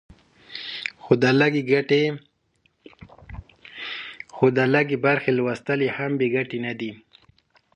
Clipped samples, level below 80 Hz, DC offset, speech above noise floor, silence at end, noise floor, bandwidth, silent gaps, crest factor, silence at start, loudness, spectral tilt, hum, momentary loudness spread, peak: under 0.1%; -54 dBFS; under 0.1%; 46 dB; 0.8 s; -67 dBFS; 9.4 kHz; none; 22 dB; 0.5 s; -22 LUFS; -7 dB/octave; none; 20 LU; -2 dBFS